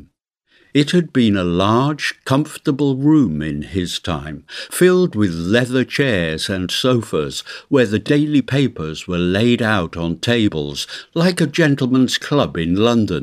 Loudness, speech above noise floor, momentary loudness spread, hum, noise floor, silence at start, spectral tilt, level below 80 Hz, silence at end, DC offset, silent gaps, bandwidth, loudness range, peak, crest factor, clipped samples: -17 LUFS; 44 dB; 8 LU; none; -61 dBFS; 0.75 s; -5.5 dB/octave; -44 dBFS; 0 s; under 0.1%; none; 15.5 kHz; 1 LU; 0 dBFS; 16 dB; under 0.1%